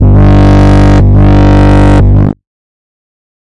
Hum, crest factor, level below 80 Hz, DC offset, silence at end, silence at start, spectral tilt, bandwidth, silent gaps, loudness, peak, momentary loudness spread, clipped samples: 50 Hz at -15 dBFS; 6 dB; -10 dBFS; 10%; 1 s; 0 s; -8.5 dB/octave; 8 kHz; none; -5 LUFS; 0 dBFS; 4 LU; under 0.1%